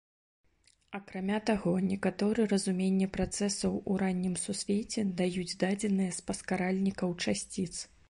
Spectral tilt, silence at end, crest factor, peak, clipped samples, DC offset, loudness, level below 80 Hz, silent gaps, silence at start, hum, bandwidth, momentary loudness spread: -5 dB/octave; 0.25 s; 18 dB; -14 dBFS; under 0.1%; under 0.1%; -32 LUFS; -56 dBFS; none; 0.9 s; none; 11.5 kHz; 7 LU